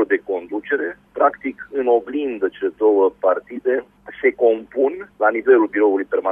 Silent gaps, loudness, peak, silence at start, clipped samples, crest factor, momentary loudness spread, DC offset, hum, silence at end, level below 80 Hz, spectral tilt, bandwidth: none; -19 LUFS; -2 dBFS; 0 s; under 0.1%; 18 dB; 10 LU; under 0.1%; none; 0 s; -62 dBFS; -7.5 dB/octave; 3.6 kHz